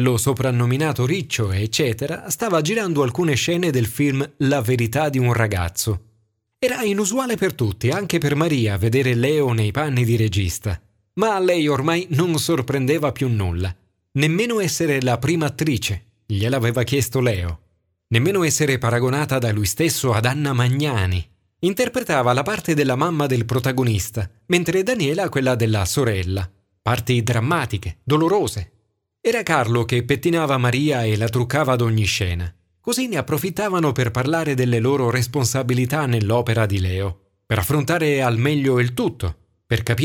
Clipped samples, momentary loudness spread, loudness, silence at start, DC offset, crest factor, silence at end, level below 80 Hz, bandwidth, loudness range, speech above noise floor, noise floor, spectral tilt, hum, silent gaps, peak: under 0.1%; 6 LU; -20 LUFS; 0 s; under 0.1%; 18 dB; 0 s; -44 dBFS; 18 kHz; 2 LU; 46 dB; -66 dBFS; -5.5 dB/octave; none; none; -2 dBFS